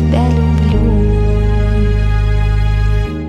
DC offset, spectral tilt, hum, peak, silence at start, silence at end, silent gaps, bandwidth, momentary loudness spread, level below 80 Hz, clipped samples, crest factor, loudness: under 0.1%; -8.5 dB/octave; none; -2 dBFS; 0 s; 0 s; none; 7 kHz; 2 LU; -14 dBFS; under 0.1%; 10 dB; -14 LUFS